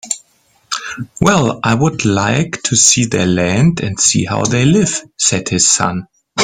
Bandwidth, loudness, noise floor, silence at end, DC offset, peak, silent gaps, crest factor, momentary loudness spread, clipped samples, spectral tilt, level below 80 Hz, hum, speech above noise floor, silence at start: 16.5 kHz; -13 LUFS; -55 dBFS; 0 s; under 0.1%; 0 dBFS; none; 14 dB; 13 LU; under 0.1%; -3.5 dB/octave; -44 dBFS; none; 42 dB; 0.05 s